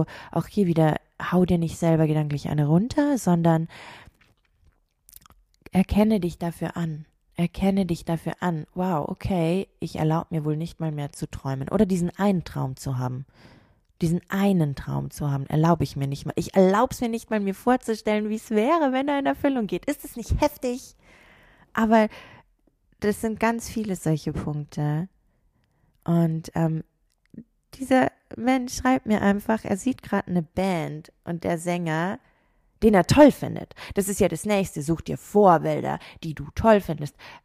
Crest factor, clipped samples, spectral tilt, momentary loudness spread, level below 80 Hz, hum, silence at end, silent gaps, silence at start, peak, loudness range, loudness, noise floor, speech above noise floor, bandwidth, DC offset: 20 dB; under 0.1%; -7 dB/octave; 12 LU; -46 dBFS; none; 0.1 s; none; 0 s; -4 dBFS; 6 LU; -24 LUFS; -66 dBFS; 43 dB; 15.5 kHz; under 0.1%